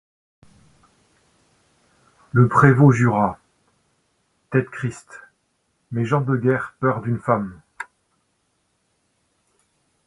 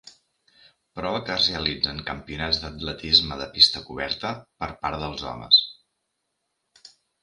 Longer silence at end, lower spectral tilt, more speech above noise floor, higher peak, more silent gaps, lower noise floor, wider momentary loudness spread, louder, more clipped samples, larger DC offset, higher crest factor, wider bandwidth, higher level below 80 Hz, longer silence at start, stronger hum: first, 2.25 s vs 0.35 s; first, -8.5 dB/octave vs -3.5 dB/octave; about the same, 51 dB vs 53 dB; about the same, 0 dBFS vs 0 dBFS; neither; second, -69 dBFS vs -78 dBFS; first, 23 LU vs 16 LU; first, -19 LUFS vs -22 LUFS; neither; neither; about the same, 22 dB vs 26 dB; about the same, 11.5 kHz vs 11.5 kHz; second, -56 dBFS vs -48 dBFS; first, 2.35 s vs 0.05 s; neither